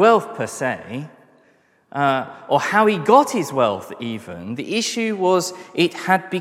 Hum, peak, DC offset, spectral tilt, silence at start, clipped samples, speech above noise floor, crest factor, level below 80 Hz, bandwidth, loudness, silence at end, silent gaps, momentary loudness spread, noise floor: none; 0 dBFS; under 0.1%; -4.5 dB/octave; 0 s; under 0.1%; 39 dB; 20 dB; -68 dBFS; 16 kHz; -20 LUFS; 0 s; none; 15 LU; -58 dBFS